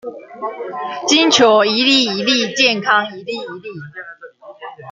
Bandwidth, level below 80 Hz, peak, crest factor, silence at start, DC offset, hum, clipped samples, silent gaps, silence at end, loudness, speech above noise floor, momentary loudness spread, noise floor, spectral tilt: 9.4 kHz; -66 dBFS; 0 dBFS; 18 dB; 0.05 s; under 0.1%; none; under 0.1%; none; 0 s; -13 LUFS; 21 dB; 22 LU; -36 dBFS; -2.5 dB/octave